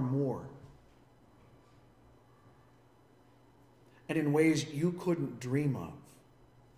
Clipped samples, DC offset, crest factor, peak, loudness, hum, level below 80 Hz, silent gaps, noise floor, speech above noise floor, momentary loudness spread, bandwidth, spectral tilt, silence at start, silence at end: under 0.1%; under 0.1%; 20 dB; -16 dBFS; -33 LUFS; none; -68 dBFS; none; -63 dBFS; 32 dB; 23 LU; 16 kHz; -6.5 dB/octave; 0 s; 0.75 s